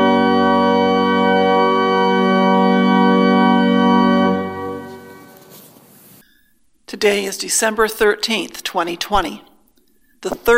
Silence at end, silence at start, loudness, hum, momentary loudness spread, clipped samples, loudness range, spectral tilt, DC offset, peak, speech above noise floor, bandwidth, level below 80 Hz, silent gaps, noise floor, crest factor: 0 s; 0 s; -15 LUFS; none; 12 LU; under 0.1%; 9 LU; -4.5 dB/octave; under 0.1%; 0 dBFS; 42 dB; 16 kHz; -44 dBFS; none; -60 dBFS; 16 dB